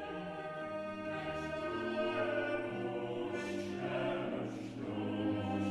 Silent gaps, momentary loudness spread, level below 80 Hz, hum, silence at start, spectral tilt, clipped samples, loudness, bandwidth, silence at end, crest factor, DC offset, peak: none; 7 LU; -66 dBFS; none; 0 s; -6.5 dB/octave; under 0.1%; -39 LUFS; 12 kHz; 0 s; 14 dB; under 0.1%; -24 dBFS